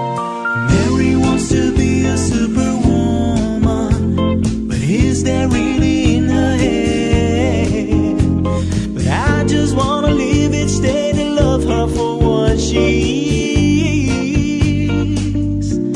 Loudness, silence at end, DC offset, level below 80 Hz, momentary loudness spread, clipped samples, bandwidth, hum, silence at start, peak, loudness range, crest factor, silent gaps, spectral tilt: -15 LUFS; 0 s; under 0.1%; -24 dBFS; 4 LU; under 0.1%; 11 kHz; none; 0 s; 0 dBFS; 1 LU; 14 dB; none; -6 dB/octave